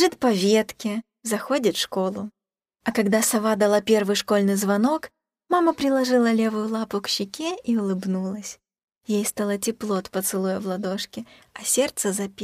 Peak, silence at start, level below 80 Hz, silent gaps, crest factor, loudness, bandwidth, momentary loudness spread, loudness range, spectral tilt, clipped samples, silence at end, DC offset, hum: -6 dBFS; 0 s; -64 dBFS; 8.84-8.88 s; 16 dB; -23 LUFS; 15.5 kHz; 11 LU; 5 LU; -4 dB/octave; under 0.1%; 0 s; under 0.1%; none